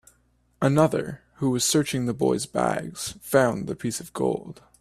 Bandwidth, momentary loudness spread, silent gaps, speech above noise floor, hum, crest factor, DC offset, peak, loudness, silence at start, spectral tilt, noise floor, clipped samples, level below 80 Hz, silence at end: 16 kHz; 11 LU; none; 40 dB; none; 20 dB; under 0.1%; -4 dBFS; -25 LUFS; 0.6 s; -5 dB/octave; -65 dBFS; under 0.1%; -58 dBFS; 0.3 s